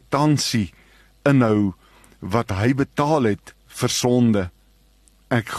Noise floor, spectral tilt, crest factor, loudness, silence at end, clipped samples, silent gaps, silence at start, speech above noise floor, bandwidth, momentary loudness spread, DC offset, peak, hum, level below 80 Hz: -56 dBFS; -5.5 dB/octave; 16 dB; -21 LUFS; 0 s; under 0.1%; none; 0.1 s; 37 dB; 13 kHz; 12 LU; under 0.1%; -4 dBFS; none; -50 dBFS